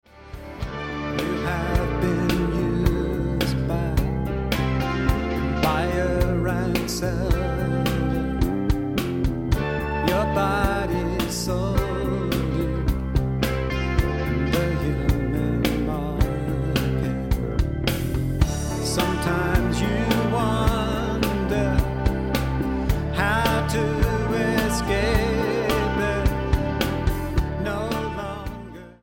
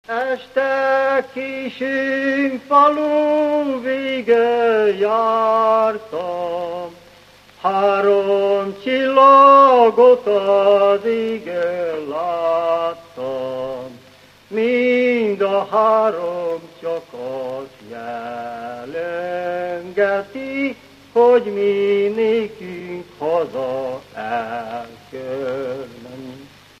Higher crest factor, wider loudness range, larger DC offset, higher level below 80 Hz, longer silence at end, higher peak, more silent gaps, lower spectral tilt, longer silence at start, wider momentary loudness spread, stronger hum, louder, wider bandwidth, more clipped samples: about the same, 18 dB vs 18 dB; second, 2 LU vs 12 LU; neither; first, -28 dBFS vs -62 dBFS; second, 0.1 s vs 0.35 s; second, -4 dBFS vs 0 dBFS; neither; about the same, -6 dB/octave vs -6 dB/octave; about the same, 0.15 s vs 0.1 s; second, 4 LU vs 16 LU; second, none vs 50 Hz at -60 dBFS; second, -24 LUFS vs -17 LUFS; first, 17 kHz vs 9.8 kHz; neither